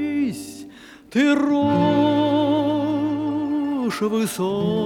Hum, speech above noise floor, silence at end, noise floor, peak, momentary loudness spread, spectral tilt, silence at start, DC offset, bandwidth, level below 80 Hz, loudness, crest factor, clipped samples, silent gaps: none; 24 dB; 0 s; -43 dBFS; -6 dBFS; 8 LU; -6 dB/octave; 0 s; under 0.1%; 16 kHz; -60 dBFS; -21 LUFS; 14 dB; under 0.1%; none